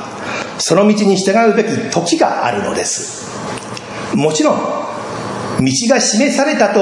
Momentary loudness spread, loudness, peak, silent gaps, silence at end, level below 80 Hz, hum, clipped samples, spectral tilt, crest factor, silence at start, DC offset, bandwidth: 12 LU; -15 LUFS; 0 dBFS; none; 0 s; -54 dBFS; none; under 0.1%; -4 dB/octave; 14 dB; 0 s; under 0.1%; 11.5 kHz